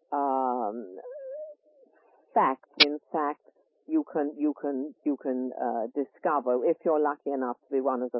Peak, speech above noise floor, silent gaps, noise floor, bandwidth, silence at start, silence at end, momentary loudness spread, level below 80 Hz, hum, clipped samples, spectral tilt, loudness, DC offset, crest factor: -4 dBFS; 34 dB; none; -62 dBFS; 5.8 kHz; 0.1 s; 0 s; 16 LU; -88 dBFS; none; under 0.1%; -7 dB/octave; -28 LUFS; under 0.1%; 26 dB